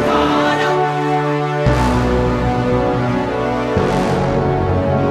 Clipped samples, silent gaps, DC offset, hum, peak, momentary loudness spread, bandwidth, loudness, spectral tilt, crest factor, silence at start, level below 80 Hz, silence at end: under 0.1%; none; under 0.1%; none; -2 dBFS; 3 LU; 13.5 kHz; -16 LUFS; -7 dB/octave; 12 dB; 0 s; -28 dBFS; 0 s